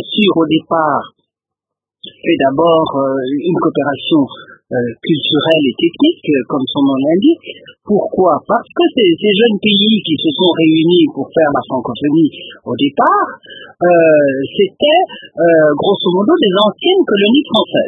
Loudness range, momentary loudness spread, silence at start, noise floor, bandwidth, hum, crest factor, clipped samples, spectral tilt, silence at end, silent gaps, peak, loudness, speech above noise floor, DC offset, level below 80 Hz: 3 LU; 7 LU; 0 s; -82 dBFS; 3.9 kHz; none; 12 dB; under 0.1%; -8 dB/octave; 0 s; none; 0 dBFS; -12 LUFS; 70 dB; under 0.1%; -56 dBFS